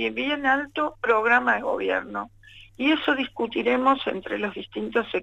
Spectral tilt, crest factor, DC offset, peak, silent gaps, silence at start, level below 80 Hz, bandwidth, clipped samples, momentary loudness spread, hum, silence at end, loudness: -5 dB/octave; 18 dB; under 0.1%; -6 dBFS; none; 0 s; -58 dBFS; 8.2 kHz; under 0.1%; 10 LU; none; 0 s; -24 LUFS